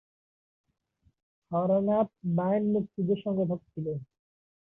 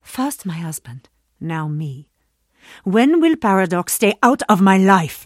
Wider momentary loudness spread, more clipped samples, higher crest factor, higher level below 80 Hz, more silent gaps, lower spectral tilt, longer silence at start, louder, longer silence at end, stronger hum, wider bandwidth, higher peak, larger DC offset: second, 10 LU vs 16 LU; neither; about the same, 16 dB vs 18 dB; second, -68 dBFS vs -58 dBFS; neither; first, -12 dB/octave vs -5.5 dB/octave; first, 1.5 s vs 0.1 s; second, -29 LUFS vs -16 LUFS; first, 0.65 s vs 0 s; neither; second, 3.7 kHz vs 16 kHz; second, -14 dBFS vs 0 dBFS; neither